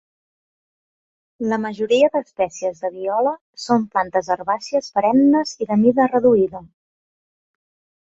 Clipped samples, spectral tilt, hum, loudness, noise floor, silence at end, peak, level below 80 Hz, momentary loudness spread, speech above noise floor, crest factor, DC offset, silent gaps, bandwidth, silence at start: under 0.1%; -5.5 dB/octave; none; -19 LUFS; under -90 dBFS; 1.45 s; -4 dBFS; -62 dBFS; 10 LU; over 72 dB; 16 dB; under 0.1%; 3.41-3.53 s; 8 kHz; 1.4 s